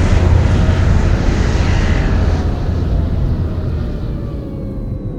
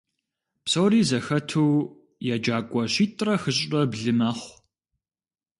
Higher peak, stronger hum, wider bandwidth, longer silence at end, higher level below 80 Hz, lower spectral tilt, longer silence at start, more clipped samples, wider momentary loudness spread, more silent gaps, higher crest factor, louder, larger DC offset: first, 0 dBFS vs -10 dBFS; neither; second, 8.2 kHz vs 11.5 kHz; second, 0 s vs 1.1 s; first, -18 dBFS vs -64 dBFS; first, -7.5 dB/octave vs -5 dB/octave; second, 0 s vs 0.65 s; neither; about the same, 11 LU vs 12 LU; neither; about the same, 14 dB vs 16 dB; first, -16 LUFS vs -24 LUFS; neither